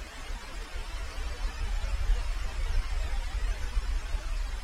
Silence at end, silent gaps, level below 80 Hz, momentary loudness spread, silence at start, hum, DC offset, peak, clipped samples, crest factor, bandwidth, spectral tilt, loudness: 0 s; none; -30 dBFS; 8 LU; 0 s; none; under 0.1%; -16 dBFS; under 0.1%; 16 dB; 12.5 kHz; -4 dB/octave; -36 LUFS